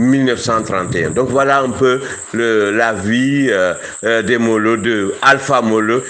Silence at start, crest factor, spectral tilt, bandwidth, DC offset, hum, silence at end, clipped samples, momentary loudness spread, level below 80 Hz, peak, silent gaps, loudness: 0 s; 14 dB; -5 dB/octave; 9.8 kHz; under 0.1%; none; 0 s; under 0.1%; 5 LU; -50 dBFS; 0 dBFS; none; -14 LUFS